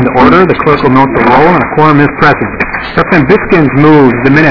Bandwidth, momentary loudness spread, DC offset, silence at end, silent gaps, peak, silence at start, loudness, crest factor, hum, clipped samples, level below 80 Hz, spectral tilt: 5.4 kHz; 6 LU; 3%; 0 s; none; 0 dBFS; 0 s; -6 LUFS; 6 dB; none; 10%; -30 dBFS; -8.5 dB/octave